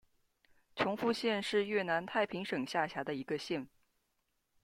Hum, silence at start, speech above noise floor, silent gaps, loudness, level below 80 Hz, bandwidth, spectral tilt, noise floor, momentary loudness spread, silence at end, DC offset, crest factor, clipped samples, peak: none; 0.75 s; 46 dB; none; -35 LUFS; -74 dBFS; 15.5 kHz; -5 dB/octave; -81 dBFS; 7 LU; 0.95 s; under 0.1%; 20 dB; under 0.1%; -18 dBFS